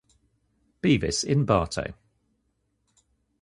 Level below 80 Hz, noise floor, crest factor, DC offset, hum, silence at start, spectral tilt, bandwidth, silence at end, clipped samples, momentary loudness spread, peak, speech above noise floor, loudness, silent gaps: -46 dBFS; -73 dBFS; 22 dB; under 0.1%; none; 0.85 s; -5 dB/octave; 11.5 kHz; 1.5 s; under 0.1%; 10 LU; -6 dBFS; 50 dB; -25 LUFS; none